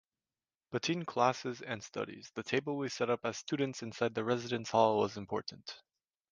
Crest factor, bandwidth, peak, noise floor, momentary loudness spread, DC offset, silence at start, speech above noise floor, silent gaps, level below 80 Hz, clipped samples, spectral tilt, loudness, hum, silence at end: 22 dB; 10 kHz; -12 dBFS; under -90 dBFS; 12 LU; under 0.1%; 0.7 s; over 55 dB; none; -74 dBFS; under 0.1%; -5 dB/octave; -35 LUFS; none; 0.55 s